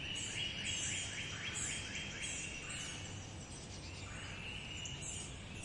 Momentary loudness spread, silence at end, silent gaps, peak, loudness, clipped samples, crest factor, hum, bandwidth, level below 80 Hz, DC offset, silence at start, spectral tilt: 10 LU; 0 s; none; -28 dBFS; -42 LUFS; under 0.1%; 16 dB; none; 11.5 kHz; -58 dBFS; under 0.1%; 0 s; -2 dB/octave